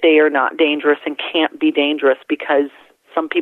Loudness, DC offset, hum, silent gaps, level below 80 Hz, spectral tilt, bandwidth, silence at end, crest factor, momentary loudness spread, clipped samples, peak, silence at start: -17 LUFS; under 0.1%; none; none; -74 dBFS; -5.5 dB/octave; 4.1 kHz; 0 s; 14 dB; 7 LU; under 0.1%; -4 dBFS; 0 s